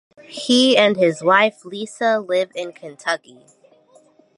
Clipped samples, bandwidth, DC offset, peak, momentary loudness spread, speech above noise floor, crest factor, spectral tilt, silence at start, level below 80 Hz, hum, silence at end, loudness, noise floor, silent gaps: under 0.1%; 11.5 kHz; under 0.1%; -2 dBFS; 17 LU; 35 dB; 18 dB; -3.5 dB/octave; 0.3 s; -74 dBFS; none; 1.2 s; -17 LUFS; -53 dBFS; none